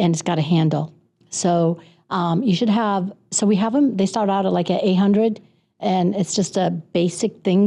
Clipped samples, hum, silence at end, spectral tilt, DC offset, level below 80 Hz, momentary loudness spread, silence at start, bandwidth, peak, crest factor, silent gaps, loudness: under 0.1%; none; 0 s; -6 dB/octave; under 0.1%; -64 dBFS; 7 LU; 0 s; 11 kHz; -10 dBFS; 10 dB; none; -20 LUFS